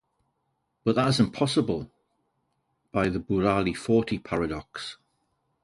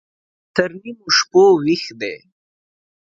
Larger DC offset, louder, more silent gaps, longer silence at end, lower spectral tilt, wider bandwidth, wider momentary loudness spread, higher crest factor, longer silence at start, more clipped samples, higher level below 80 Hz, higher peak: neither; second, -26 LUFS vs -16 LUFS; neither; second, 0.7 s vs 0.9 s; first, -6 dB/octave vs -3.5 dB/octave; first, 11.5 kHz vs 7.6 kHz; second, 12 LU vs 16 LU; about the same, 20 dB vs 18 dB; first, 0.85 s vs 0.55 s; neither; first, -52 dBFS vs -62 dBFS; second, -8 dBFS vs 0 dBFS